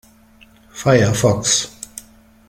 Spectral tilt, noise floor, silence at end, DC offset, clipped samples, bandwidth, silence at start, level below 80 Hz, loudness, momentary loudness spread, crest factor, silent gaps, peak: -4 dB/octave; -49 dBFS; 0.5 s; under 0.1%; under 0.1%; 16.5 kHz; 0.75 s; -48 dBFS; -16 LUFS; 21 LU; 18 dB; none; -2 dBFS